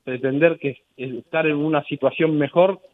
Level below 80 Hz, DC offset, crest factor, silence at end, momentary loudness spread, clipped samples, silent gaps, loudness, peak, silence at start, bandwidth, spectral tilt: -70 dBFS; under 0.1%; 20 dB; 0.2 s; 13 LU; under 0.1%; none; -20 LUFS; -2 dBFS; 0.05 s; 4 kHz; -9.5 dB/octave